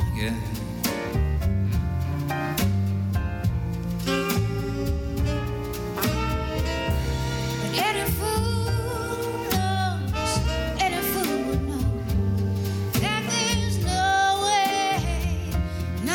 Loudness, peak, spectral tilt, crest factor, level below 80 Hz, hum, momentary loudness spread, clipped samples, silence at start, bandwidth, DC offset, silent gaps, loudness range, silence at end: -25 LUFS; -10 dBFS; -5 dB/octave; 14 dB; -32 dBFS; none; 6 LU; under 0.1%; 0 s; 19 kHz; under 0.1%; none; 3 LU; 0 s